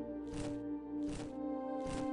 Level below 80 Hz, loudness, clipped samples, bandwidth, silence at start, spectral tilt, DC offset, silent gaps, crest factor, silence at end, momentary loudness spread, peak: -56 dBFS; -42 LUFS; under 0.1%; 11 kHz; 0 s; -6.5 dB/octave; under 0.1%; none; 12 dB; 0 s; 2 LU; -28 dBFS